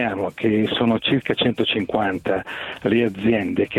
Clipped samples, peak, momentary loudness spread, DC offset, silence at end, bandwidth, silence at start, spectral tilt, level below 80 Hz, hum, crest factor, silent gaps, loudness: under 0.1%; -6 dBFS; 5 LU; under 0.1%; 0 s; 11.5 kHz; 0 s; -7 dB/octave; -54 dBFS; none; 16 dB; none; -21 LUFS